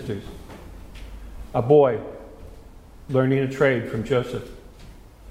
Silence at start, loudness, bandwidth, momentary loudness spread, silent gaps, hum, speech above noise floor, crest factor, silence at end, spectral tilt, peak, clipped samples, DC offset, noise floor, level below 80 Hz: 0 s; -22 LUFS; 14.5 kHz; 25 LU; none; none; 23 dB; 20 dB; 0 s; -7.5 dB/octave; -4 dBFS; under 0.1%; under 0.1%; -44 dBFS; -44 dBFS